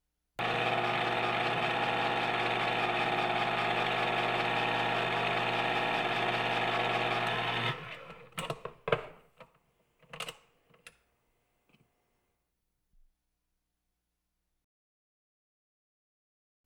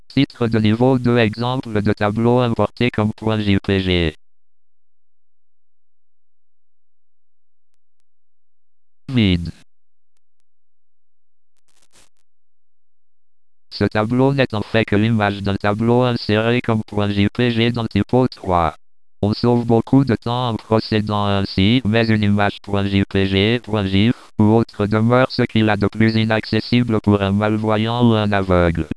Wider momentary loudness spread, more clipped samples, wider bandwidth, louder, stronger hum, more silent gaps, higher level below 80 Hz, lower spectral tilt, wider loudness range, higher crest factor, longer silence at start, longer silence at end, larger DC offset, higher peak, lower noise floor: first, 11 LU vs 5 LU; neither; first, 18 kHz vs 11 kHz; second, -31 LUFS vs -17 LUFS; first, 60 Hz at -50 dBFS vs none; neither; second, -66 dBFS vs -42 dBFS; second, -4.5 dB/octave vs -8 dB/octave; first, 21 LU vs 9 LU; about the same, 22 dB vs 18 dB; first, 0.4 s vs 0.15 s; first, 5.75 s vs 0.1 s; second, under 0.1% vs 0.6%; second, -12 dBFS vs -2 dBFS; second, -84 dBFS vs under -90 dBFS